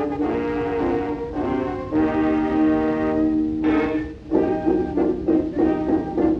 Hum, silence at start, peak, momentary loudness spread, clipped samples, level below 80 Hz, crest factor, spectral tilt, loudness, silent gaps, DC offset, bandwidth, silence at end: none; 0 s; -6 dBFS; 5 LU; under 0.1%; -40 dBFS; 14 dB; -9 dB/octave; -22 LUFS; none; under 0.1%; 5.8 kHz; 0 s